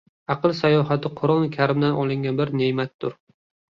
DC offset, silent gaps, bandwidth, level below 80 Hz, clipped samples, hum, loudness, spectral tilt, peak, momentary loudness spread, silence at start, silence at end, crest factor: under 0.1%; 2.94-2.99 s; 7.2 kHz; -60 dBFS; under 0.1%; none; -22 LUFS; -8.5 dB/octave; -6 dBFS; 9 LU; 0.3 s; 0.65 s; 16 dB